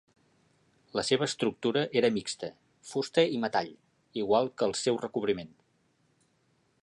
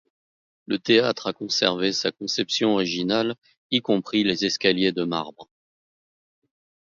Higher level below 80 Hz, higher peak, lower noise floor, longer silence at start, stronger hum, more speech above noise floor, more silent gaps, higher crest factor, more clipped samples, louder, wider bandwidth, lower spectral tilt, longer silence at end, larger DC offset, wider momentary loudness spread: about the same, -70 dBFS vs -66 dBFS; second, -10 dBFS vs -2 dBFS; second, -71 dBFS vs under -90 dBFS; first, 0.95 s vs 0.7 s; neither; second, 42 dB vs over 67 dB; second, none vs 3.38-3.42 s, 3.57-3.70 s; about the same, 22 dB vs 22 dB; neither; second, -30 LUFS vs -23 LUFS; first, 11.5 kHz vs 7.6 kHz; about the same, -4 dB/octave vs -4 dB/octave; about the same, 1.35 s vs 1.45 s; neither; about the same, 11 LU vs 9 LU